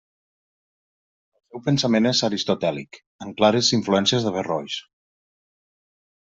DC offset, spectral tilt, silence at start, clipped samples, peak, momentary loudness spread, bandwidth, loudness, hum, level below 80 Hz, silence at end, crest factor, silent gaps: under 0.1%; -4.5 dB/octave; 1.55 s; under 0.1%; -4 dBFS; 17 LU; 8 kHz; -21 LUFS; none; -64 dBFS; 1.55 s; 22 dB; 3.06-3.19 s